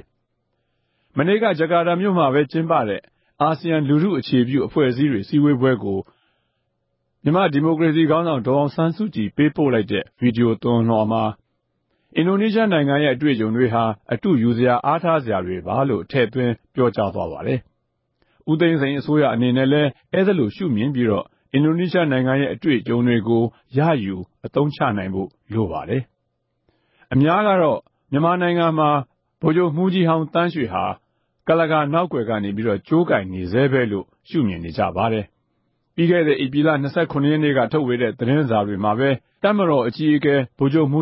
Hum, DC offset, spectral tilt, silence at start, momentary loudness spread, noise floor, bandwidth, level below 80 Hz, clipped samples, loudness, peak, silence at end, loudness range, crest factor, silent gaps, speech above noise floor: none; under 0.1%; -12 dB/octave; 1.15 s; 7 LU; -72 dBFS; 5.8 kHz; -52 dBFS; under 0.1%; -19 LUFS; -4 dBFS; 0 s; 3 LU; 16 dB; none; 54 dB